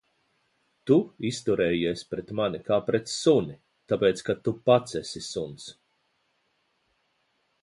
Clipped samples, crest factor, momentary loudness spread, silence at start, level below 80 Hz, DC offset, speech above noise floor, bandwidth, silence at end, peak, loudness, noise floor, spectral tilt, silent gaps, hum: under 0.1%; 20 dB; 11 LU; 0.85 s; -60 dBFS; under 0.1%; 47 dB; 11.5 kHz; 1.9 s; -8 dBFS; -26 LUFS; -73 dBFS; -5.5 dB/octave; none; none